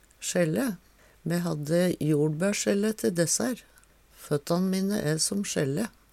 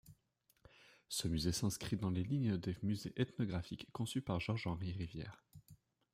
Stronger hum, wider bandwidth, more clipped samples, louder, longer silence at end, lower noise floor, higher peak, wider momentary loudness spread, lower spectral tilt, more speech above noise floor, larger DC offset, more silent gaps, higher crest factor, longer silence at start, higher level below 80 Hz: neither; about the same, 16.5 kHz vs 16 kHz; neither; first, -27 LUFS vs -40 LUFS; second, 0.25 s vs 0.4 s; second, -56 dBFS vs -78 dBFS; first, -12 dBFS vs -22 dBFS; about the same, 7 LU vs 9 LU; about the same, -5 dB/octave vs -5.5 dB/octave; second, 29 dB vs 39 dB; neither; neither; about the same, 16 dB vs 18 dB; first, 0.2 s vs 0.05 s; about the same, -62 dBFS vs -62 dBFS